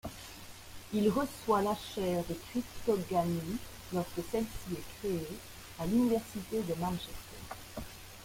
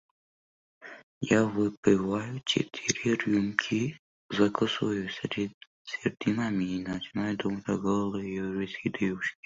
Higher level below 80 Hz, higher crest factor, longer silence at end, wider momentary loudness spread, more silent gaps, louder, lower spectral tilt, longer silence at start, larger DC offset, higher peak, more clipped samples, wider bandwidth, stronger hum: first, -54 dBFS vs -62 dBFS; about the same, 18 dB vs 22 dB; second, 0 s vs 0.15 s; first, 16 LU vs 9 LU; second, none vs 1.03-1.21 s, 1.77-1.83 s, 3.99-4.29 s, 5.54-5.61 s, 5.67-5.85 s; second, -35 LUFS vs -30 LUFS; about the same, -6 dB/octave vs -5 dB/octave; second, 0.05 s vs 0.8 s; neither; second, -18 dBFS vs -6 dBFS; neither; first, 16.5 kHz vs 7.8 kHz; neither